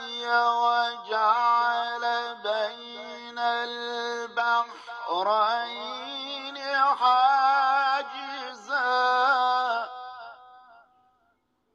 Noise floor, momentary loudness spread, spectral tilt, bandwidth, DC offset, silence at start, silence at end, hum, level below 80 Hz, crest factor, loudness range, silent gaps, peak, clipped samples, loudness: -71 dBFS; 15 LU; -1 dB/octave; 7.8 kHz; under 0.1%; 0 s; 1.15 s; none; -82 dBFS; 16 dB; 5 LU; none; -10 dBFS; under 0.1%; -25 LUFS